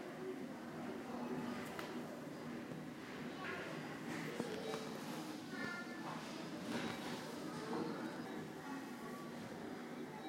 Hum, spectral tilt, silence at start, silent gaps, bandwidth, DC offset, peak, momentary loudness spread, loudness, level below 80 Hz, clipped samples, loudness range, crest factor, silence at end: none; -5 dB/octave; 0 s; none; 16 kHz; under 0.1%; -28 dBFS; 5 LU; -47 LUFS; -80 dBFS; under 0.1%; 2 LU; 18 dB; 0 s